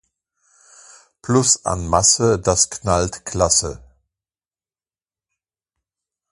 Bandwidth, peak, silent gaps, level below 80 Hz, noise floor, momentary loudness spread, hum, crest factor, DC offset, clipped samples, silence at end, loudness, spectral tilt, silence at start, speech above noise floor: 11.5 kHz; 0 dBFS; none; -40 dBFS; under -90 dBFS; 8 LU; none; 22 dB; under 0.1%; under 0.1%; 2.55 s; -17 LUFS; -3.5 dB/octave; 1.25 s; over 72 dB